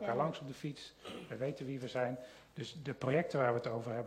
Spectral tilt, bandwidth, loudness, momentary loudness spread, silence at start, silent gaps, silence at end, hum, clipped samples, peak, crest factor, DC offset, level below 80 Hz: -6.5 dB/octave; 15.5 kHz; -39 LUFS; 14 LU; 0 s; none; 0 s; none; under 0.1%; -20 dBFS; 18 dB; under 0.1%; -72 dBFS